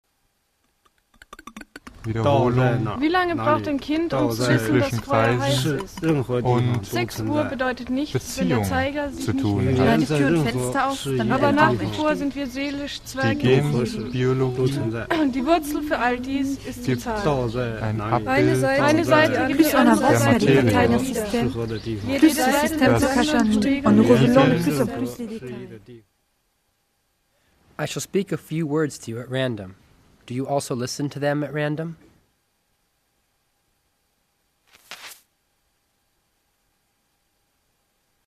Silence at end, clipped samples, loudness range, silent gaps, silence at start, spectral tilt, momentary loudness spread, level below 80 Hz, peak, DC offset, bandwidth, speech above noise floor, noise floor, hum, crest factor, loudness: 3.15 s; under 0.1%; 10 LU; none; 1.45 s; -6 dB/octave; 13 LU; -46 dBFS; -2 dBFS; under 0.1%; 14.5 kHz; 49 dB; -70 dBFS; none; 20 dB; -21 LUFS